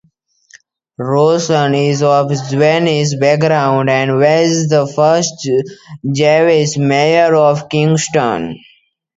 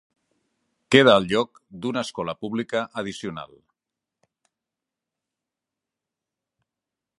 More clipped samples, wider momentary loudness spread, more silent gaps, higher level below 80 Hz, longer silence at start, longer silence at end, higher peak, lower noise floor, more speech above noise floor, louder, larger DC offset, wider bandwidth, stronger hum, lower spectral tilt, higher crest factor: neither; second, 7 LU vs 17 LU; neither; first, -56 dBFS vs -62 dBFS; about the same, 1 s vs 0.9 s; second, 0.6 s vs 3.75 s; about the same, 0 dBFS vs 0 dBFS; second, -54 dBFS vs -87 dBFS; second, 42 dB vs 65 dB; first, -12 LUFS vs -22 LUFS; neither; second, 8 kHz vs 11.5 kHz; neither; about the same, -5.5 dB/octave vs -5 dB/octave; second, 12 dB vs 26 dB